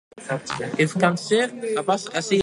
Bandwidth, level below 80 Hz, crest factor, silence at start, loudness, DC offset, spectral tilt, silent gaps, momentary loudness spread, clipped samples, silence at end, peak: 11.5 kHz; -66 dBFS; 20 dB; 0.15 s; -23 LUFS; under 0.1%; -4.5 dB/octave; none; 8 LU; under 0.1%; 0 s; -4 dBFS